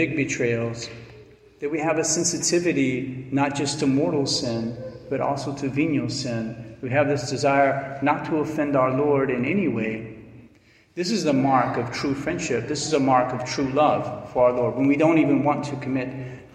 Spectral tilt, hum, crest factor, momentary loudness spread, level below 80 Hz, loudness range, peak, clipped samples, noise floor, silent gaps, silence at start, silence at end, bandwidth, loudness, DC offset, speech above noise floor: -5 dB/octave; none; 18 dB; 10 LU; -56 dBFS; 3 LU; -6 dBFS; under 0.1%; -55 dBFS; none; 0 s; 0.1 s; 12.5 kHz; -23 LUFS; under 0.1%; 33 dB